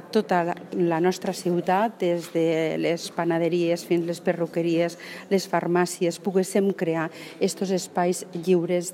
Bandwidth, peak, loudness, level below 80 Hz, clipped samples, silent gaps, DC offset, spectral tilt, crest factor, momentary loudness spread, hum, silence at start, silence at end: 16 kHz; -8 dBFS; -25 LUFS; -76 dBFS; under 0.1%; none; under 0.1%; -5.5 dB/octave; 16 dB; 5 LU; none; 0 s; 0 s